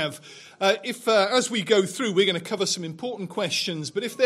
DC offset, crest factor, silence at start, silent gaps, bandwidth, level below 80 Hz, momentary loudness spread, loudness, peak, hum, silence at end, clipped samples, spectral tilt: under 0.1%; 20 dB; 0 s; none; 15.5 kHz; -78 dBFS; 10 LU; -24 LUFS; -4 dBFS; none; 0 s; under 0.1%; -3 dB/octave